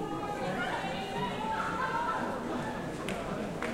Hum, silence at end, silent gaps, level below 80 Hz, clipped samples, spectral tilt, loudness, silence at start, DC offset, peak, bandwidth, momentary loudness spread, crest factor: none; 0 s; none; -54 dBFS; under 0.1%; -5 dB/octave; -34 LUFS; 0 s; under 0.1%; -18 dBFS; 16.5 kHz; 4 LU; 16 dB